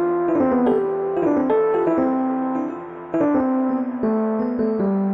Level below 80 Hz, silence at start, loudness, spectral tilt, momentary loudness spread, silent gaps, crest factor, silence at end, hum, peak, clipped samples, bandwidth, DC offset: -56 dBFS; 0 s; -20 LUFS; -10 dB/octave; 5 LU; none; 12 dB; 0 s; none; -8 dBFS; under 0.1%; 3.8 kHz; under 0.1%